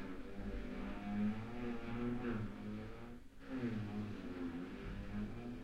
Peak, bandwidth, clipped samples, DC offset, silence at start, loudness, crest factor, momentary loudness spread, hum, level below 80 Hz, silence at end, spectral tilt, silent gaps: -30 dBFS; 11 kHz; under 0.1%; under 0.1%; 0 s; -45 LUFS; 14 dB; 8 LU; none; -54 dBFS; 0 s; -8 dB/octave; none